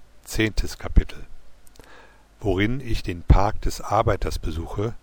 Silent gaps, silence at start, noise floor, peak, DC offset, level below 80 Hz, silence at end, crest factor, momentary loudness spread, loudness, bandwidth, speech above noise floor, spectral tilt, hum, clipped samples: none; 0 s; -48 dBFS; -6 dBFS; under 0.1%; -26 dBFS; 0.05 s; 18 dB; 11 LU; -25 LUFS; 19 kHz; 27 dB; -6 dB/octave; none; under 0.1%